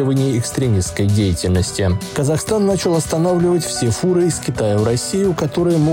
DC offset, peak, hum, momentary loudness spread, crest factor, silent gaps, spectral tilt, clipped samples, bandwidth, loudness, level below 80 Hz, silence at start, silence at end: under 0.1%; -6 dBFS; none; 3 LU; 10 dB; none; -5.5 dB/octave; under 0.1%; 17 kHz; -17 LUFS; -40 dBFS; 0 s; 0 s